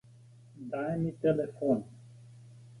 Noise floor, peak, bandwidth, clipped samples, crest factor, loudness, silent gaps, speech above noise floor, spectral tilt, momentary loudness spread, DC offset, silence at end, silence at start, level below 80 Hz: -56 dBFS; -16 dBFS; 11.5 kHz; under 0.1%; 18 dB; -32 LUFS; none; 25 dB; -9 dB/octave; 24 LU; under 0.1%; 0 s; 0.55 s; -66 dBFS